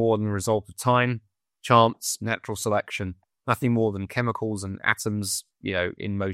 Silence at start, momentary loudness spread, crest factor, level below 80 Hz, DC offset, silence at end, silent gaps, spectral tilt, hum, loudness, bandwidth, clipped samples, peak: 0 s; 10 LU; 22 dB; -58 dBFS; under 0.1%; 0 s; none; -5 dB/octave; none; -25 LUFS; 16 kHz; under 0.1%; -4 dBFS